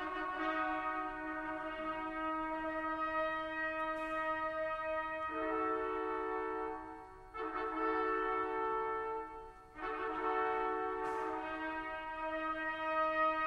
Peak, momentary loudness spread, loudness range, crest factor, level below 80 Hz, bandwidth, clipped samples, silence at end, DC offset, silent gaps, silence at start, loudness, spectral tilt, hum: -24 dBFS; 7 LU; 1 LU; 14 dB; -62 dBFS; 11 kHz; under 0.1%; 0 s; under 0.1%; none; 0 s; -38 LUFS; -5.5 dB/octave; none